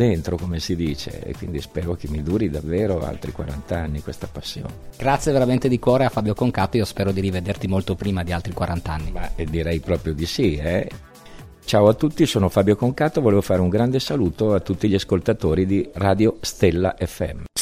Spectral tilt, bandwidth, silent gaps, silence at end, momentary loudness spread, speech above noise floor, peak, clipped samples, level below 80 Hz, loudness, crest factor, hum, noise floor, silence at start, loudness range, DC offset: -6.5 dB/octave; 16 kHz; none; 0 s; 12 LU; 21 dB; -4 dBFS; under 0.1%; -36 dBFS; -22 LUFS; 18 dB; none; -41 dBFS; 0 s; 6 LU; under 0.1%